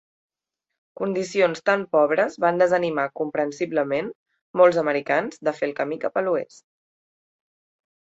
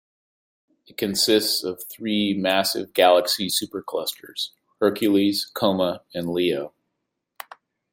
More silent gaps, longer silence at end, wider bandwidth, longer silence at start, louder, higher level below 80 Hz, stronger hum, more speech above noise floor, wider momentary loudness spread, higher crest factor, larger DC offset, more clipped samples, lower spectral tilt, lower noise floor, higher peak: first, 4.15-4.26 s, 4.41-4.54 s vs none; first, 1.7 s vs 1.25 s; second, 8 kHz vs 16.5 kHz; about the same, 1 s vs 1 s; about the same, -22 LUFS vs -22 LUFS; about the same, -70 dBFS vs -66 dBFS; neither; first, 62 dB vs 57 dB; second, 9 LU vs 13 LU; about the same, 20 dB vs 20 dB; neither; neither; first, -5.5 dB/octave vs -3.5 dB/octave; first, -84 dBFS vs -79 dBFS; about the same, -4 dBFS vs -4 dBFS